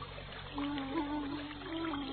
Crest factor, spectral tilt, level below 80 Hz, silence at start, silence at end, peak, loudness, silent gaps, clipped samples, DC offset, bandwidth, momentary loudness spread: 14 dB; -3.5 dB/octave; -54 dBFS; 0 s; 0 s; -24 dBFS; -39 LUFS; none; under 0.1%; under 0.1%; 4.6 kHz; 7 LU